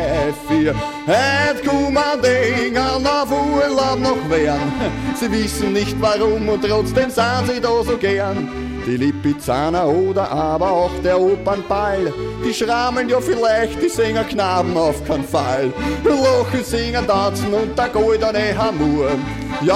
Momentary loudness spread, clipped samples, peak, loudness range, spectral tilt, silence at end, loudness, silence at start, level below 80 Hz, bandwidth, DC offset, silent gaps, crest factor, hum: 5 LU; under 0.1%; -4 dBFS; 2 LU; -5.5 dB/octave; 0 s; -18 LUFS; 0 s; -36 dBFS; 16 kHz; under 0.1%; none; 14 dB; none